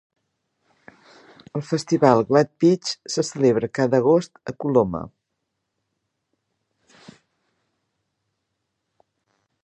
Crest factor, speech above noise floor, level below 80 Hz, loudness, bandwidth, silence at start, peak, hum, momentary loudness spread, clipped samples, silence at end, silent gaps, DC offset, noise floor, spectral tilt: 24 dB; 58 dB; -60 dBFS; -20 LUFS; 10.5 kHz; 1.55 s; 0 dBFS; none; 15 LU; under 0.1%; 4.55 s; none; under 0.1%; -78 dBFS; -6 dB/octave